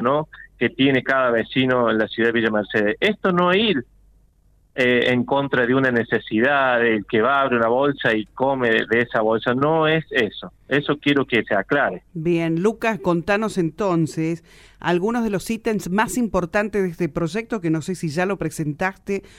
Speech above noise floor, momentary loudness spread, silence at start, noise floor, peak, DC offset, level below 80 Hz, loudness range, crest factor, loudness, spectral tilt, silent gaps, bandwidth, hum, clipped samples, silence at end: 37 dB; 7 LU; 0 s; -57 dBFS; -4 dBFS; under 0.1%; -50 dBFS; 4 LU; 16 dB; -20 LUFS; -5.5 dB/octave; none; 16 kHz; none; under 0.1%; 0.2 s